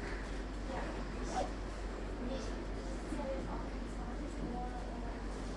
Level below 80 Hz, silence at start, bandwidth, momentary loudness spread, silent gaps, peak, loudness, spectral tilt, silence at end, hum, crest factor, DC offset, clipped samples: -44 dBFS; 0 s; 11 kHz; 4 LU; none; -26 dBFS; -42 LUFS; -6 dB/octave; 0 s; none; 14 dB; under 0.1%; under 0.1%